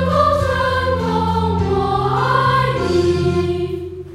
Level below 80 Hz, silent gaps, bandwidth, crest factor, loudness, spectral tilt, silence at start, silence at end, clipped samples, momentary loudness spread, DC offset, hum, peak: -38 dBFS; none; 14 kHz; 14 dB; -17 LUFS; -7 dB/octave; 0 s; 0 s; under 0.1%; 5 LU; under 0.1%; none; -2 dBFS